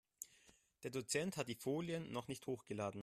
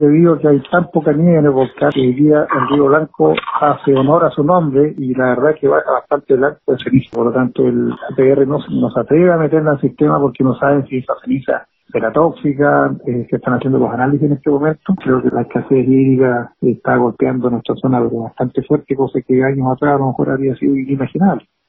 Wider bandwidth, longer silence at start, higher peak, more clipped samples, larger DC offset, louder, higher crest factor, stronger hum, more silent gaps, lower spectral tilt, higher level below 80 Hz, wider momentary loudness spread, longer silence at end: first, 15 kHz vs 4 kHz; first, 0.2 s vs 0 s; second, -26 dBFS vs 0 dBFS; neither; neither; second, -45 LUFS vs -14 LUFS; first, 20 dB vs 14 dB; neither; neither; second, -4.5 dB/octave vs -11.5 dB/octave; second, -78 dBFS vs -50 dBFS; first, 13 LU vs 6 LU; second, 0 s vs 0.3 s